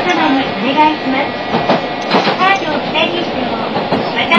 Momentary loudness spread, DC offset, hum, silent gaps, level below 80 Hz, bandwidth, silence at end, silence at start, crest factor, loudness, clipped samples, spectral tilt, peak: 5 LU; 0.4%; none; none; -48 dBFS; 8 kHz; 0 s; 0 s; 14 dB; -14 LUFS; under 0.1%; -5 dB/octave; 0 dBFS